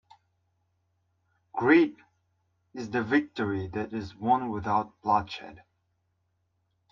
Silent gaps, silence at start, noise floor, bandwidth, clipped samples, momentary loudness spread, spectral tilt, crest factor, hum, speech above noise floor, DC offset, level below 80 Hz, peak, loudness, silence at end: none; 1.55 s; -75 dBFS; 7.2 kHz; under 0.1%; 18 LU; -7 dB/octave; 22 dB; none; 48 dB; under 0.1%; -64 dBFS; -8 dBFS; -27 LUFS; 1.35 s